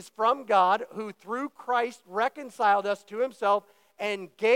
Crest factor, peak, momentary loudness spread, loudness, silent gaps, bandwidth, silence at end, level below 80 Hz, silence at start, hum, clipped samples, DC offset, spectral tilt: 18 dB; -10 dBFS; 11 LU; -27 LUFS; none; 16.5 kHz; 0 s; under -90 dBFS; 0 s; none; under 0.1%; under 0.1%; -4 dB/octave